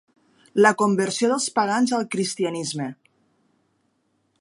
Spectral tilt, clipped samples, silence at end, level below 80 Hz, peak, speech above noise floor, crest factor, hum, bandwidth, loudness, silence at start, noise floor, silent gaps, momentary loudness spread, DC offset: -4 dB/octave; under 0.1%; 1.45 s; -74 dBFS; -2 dBFS; 48 dB; 22 dB; none; 11.5 kHz; -22 LUFS; 0.55 s; -69 dBFS; none; 11 LU; under 0.1%